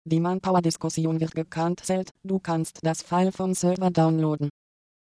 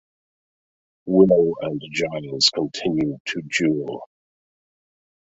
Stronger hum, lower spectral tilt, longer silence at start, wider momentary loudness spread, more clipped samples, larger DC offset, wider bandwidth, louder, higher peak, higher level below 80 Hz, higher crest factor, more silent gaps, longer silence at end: neither; first, -6.5 dB/octave vs -4.5 dB/octave; second, 0.05 s vs 1.05 s; second, 7 LU vs 13 LU; neither; neither; first, 11 kHz vs 8 kHz; second, -25 LUFS vs -21 LUFS; second, -8 dBFS vs -2 dBFS; about the same, -62 dBFS vs -58 dBFS; about the same, 16 dB vs 20 dB; about the same, 2.11-2.15 s vs 3.20-3.25 s; second, 0.5 s vs 1.35 s